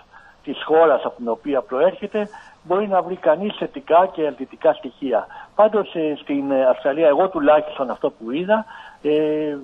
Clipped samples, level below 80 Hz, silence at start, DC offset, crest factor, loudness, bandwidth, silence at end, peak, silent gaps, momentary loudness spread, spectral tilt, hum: under 0.1%; -60 dBFS; 0.45 s; under 0.1%; 16 dB; -20 LUFS; 4.9 kHz; 0 s; -4 dBFS; none; 10 LU; -7.5 dB/octave; none